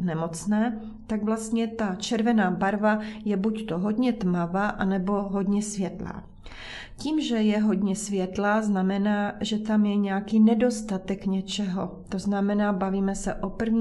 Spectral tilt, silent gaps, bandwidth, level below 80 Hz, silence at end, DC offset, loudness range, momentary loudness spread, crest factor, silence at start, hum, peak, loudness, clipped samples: -6 dB/octave; none; 12 kHz; -50 dBFS; 0 s; under 0.1%; 3 LU; 9 LU; 14 dB; 0 s; none; -10 dBFS; -26 LUFS; under 0.1%